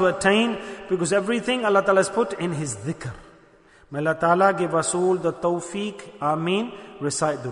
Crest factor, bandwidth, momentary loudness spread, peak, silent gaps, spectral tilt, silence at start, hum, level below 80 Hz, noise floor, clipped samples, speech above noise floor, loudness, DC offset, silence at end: 18 dB; 11 kHz; 12 LU; -4 dBFS; none; -4.5 dB/octave; 0 s; none; -58 dBFS; -53 dBFS; under 0.1%; 31 dB; -23 LUFS; under 0.1%; 0 s